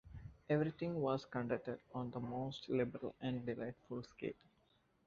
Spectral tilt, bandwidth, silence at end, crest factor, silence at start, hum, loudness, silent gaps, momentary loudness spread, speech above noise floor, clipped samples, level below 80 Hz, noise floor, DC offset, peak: -6.5 dB/octave; 7.4 kHz; 0.75 s; 18 dB; 0.05 s; none; -42 LUFS; none; 11 LU; 34 dB; under 0.1%; -68 dBFS; -76 dBFS; under 0.1%; -24 dBFS